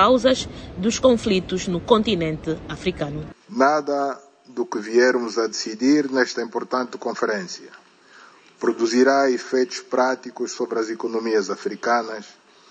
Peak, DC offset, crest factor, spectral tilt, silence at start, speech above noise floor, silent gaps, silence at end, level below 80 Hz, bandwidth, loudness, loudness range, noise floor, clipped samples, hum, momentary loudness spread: -2 dBFS; under 0.1%; 20 dB; -4.5 dB/octave; 0 s; 28 dB; none; 0.4 s; -50 dBFS; 9.4 kHz; -22 LUFS; 3 LU; -49 dBFS; under 0.1%; none; 12 LU